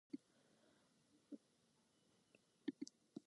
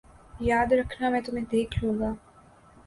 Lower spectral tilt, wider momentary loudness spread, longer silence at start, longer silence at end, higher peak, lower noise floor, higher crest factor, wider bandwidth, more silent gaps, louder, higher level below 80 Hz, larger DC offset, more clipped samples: second, -4.5 dB/octave vs -6.5 dB/octave; about the same, 10 LU vs 8 LU; second, 0.15 s vs 0.35 s; second, 0.1 s vs 0.7 s; second, -32 dBFS vs -12 dBFS; first, -79 dBFS vs -55 dBFS; first, 26 dB vs 16 dB; about the same, 11 kHz vs 11.5 kHz; neither; second, -56 LUFS vs -27 LUFS; second, under -90 dBFS vs -44 dBFS; neither; neither